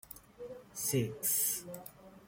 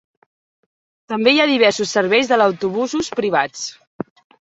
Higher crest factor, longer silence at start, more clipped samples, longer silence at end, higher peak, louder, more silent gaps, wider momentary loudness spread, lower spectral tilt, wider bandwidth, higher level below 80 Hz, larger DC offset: about the same, 18 dB vs 18 dB; second, 0.05 s vs 1.1 s; neither; second, 0 s vs 0.5 s; second, -20 dBFS vs -2 dBFS; second, -33 LUFS vs -17 LUFS; second, none vs 3.87-3.99 s; about the same, 20 LU vs 19 LU; about the same, -3.5 dB/octave vs -3.5 dB/octave; first, 16.5 kHz vs 8.2 kHz; second, -68 dBFS vs -60 dBFS; neither